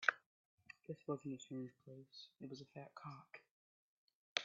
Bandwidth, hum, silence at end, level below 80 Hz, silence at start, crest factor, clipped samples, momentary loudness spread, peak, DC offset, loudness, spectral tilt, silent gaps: 7.4 kHz; none; 0 s; under -90 dBFS; 0 s; 34 dB; under 0.1%; 15 LU; -16 dBFS; under 0.1%; -50 LUFS; -2 dB/octave; 0.26-0.58 s, 3.51-4.08 s, 4.15-4.36 s